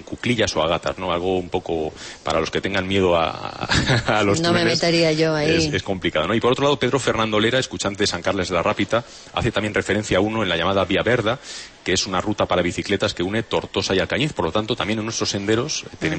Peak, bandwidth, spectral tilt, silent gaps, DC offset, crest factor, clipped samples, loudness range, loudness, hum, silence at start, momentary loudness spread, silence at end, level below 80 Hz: -4 dBFS; 8.8 kHz; -4.5 dB/octave; none; under 0.1%; 16 dB; under 0.1%; 3 LU; -21 LUFS; none; 0 s; 6 LU; 0 s; -44 dBFS